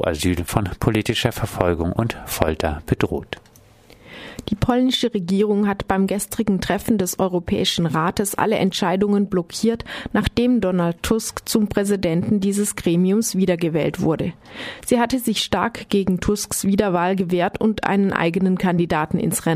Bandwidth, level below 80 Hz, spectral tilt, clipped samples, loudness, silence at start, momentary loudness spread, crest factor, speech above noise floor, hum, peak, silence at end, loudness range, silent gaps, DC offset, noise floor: 15.5 kHz; -40 dBFS; -5 dB/octave; under 0.1%; -20 LUFS; 0 s; 5 LU; 18 dB; 29 dB; none; -2 dBFS; 0 s; 3 LU; none; under 0.1%; -49 dBFS